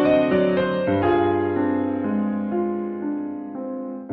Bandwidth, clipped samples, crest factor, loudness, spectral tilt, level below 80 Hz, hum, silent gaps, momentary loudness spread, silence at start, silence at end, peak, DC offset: 4.8 kHz; under 0.1%; 14 dB; -23 LUFS; -6 dB/octave; -54 dBFS; none; none; 11 LU; 0 s; 0 s; -8 dBFS; under 0.1%